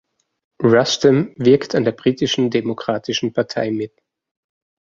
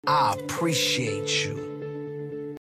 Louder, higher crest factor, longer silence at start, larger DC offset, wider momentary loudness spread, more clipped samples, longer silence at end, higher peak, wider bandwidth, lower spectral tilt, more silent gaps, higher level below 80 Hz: first, -18 LUFS vs -26 LUFS; about the same, 18 dB vs 16 dB; first, 0.6 s vs 0.05 s; neither; second, 8 LU vs 12 LU; neither; first, 1.1 s vs 0.1 s; first, -2 dBFS vs -12 dBFS; second, 7.6 kHz vs 15 kHz; first, -5.5 dB/octave vs -3.5 dB/octave; neither; first, -58 dBFS vs -64 dBFS